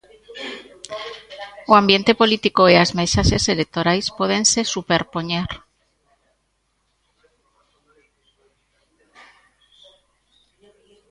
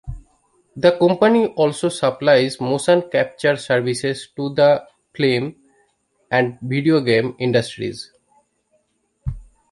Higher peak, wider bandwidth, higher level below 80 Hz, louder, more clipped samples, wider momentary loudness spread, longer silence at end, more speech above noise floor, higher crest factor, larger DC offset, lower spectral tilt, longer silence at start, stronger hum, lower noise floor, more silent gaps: about the same, 0 dBFS vs -2 dBFS; about the same, 11.5 kHz vs 11.5 kHz; first, -38 dBFS vs -44 dBFS; about the same, -17 LUFS vs -18 LUFS; neither; first, 21 LU vs 16 LU; first, 5.55 s vs 0.3 s; about the same, 52 dB vs 49 dB; about the same, 22 dB vs 18 dB; neither; second, -3.5 dB/octave vs -5.5 dB/octave; first, 0.3 s vs 0.05 s; neither; about the same, -69 dBFS vs -66 dBFS; neither